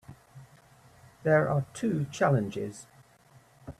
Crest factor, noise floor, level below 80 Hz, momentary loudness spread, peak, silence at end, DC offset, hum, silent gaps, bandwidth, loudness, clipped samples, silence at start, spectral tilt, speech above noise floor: 20 dB; -59 dBFS; -64 dBFS; 15 LU; -12 dBFS; 0.1 s; under 0.1%; none; none; 13 kHz; -28 LUFS; under 0.1%; 0.1 s; -7 dB/octave; 32 dB